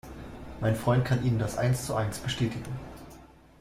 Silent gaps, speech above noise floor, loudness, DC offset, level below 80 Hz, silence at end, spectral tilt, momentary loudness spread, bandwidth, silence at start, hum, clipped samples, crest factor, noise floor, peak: none; 24 dB; -29 LUFS; under 0.1%; -48 dBFS; 0.35 s; -6 dB/octave; 18 LU; 15.5 kHz; 0.05 s; none; under 0.1%; 18 dB; -52 dBFS; -12 dBFS